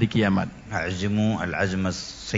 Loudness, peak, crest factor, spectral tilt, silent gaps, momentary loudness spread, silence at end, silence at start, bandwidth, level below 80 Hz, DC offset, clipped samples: -25 LUFS; -8 dBFS; 18 dB; -6 dB/octave; none; 7 LU; 0 s; 0 s; 7.8 kHz; -50 dBFS; under 0.1%; under 0.1%